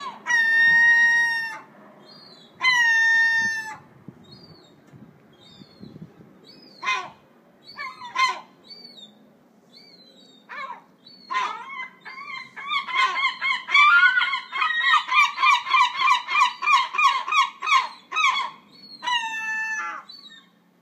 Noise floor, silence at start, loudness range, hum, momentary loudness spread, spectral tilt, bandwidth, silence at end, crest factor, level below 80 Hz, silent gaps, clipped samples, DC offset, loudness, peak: -55 dBFS; 0 s; 16 LU; none; 20 LU; 0.5 dB/octave; 15.5 kHz; 0.45 s; 18 dB; -80 dBFS; none; under 0.1%; under 0.1%; -19 LUFS; -6 dBFS